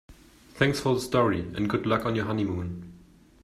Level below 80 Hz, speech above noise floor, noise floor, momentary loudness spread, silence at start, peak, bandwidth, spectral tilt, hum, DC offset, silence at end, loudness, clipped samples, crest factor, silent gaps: -52 dBFS; 28 dB; -54 dBFS; 8 LU; 0.1 s; -6 dBFS; 14.5 kHz; -6 dB/octave; none; under 0.1%; 0.45 s; -27 LUFS; under 0.1%; 20 dB; none